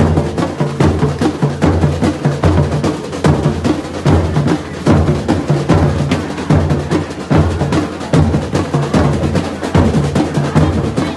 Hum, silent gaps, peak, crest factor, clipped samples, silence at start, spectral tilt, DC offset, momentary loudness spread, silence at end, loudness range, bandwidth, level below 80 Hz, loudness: none; none; 0 dBFS; 14 dB; under 0.1%; 0 s; -7 dB/octave; under 0.1%; 4 LU; 0 s; 1 LU; 12 kHz; -28 dBFS; -14 LUFS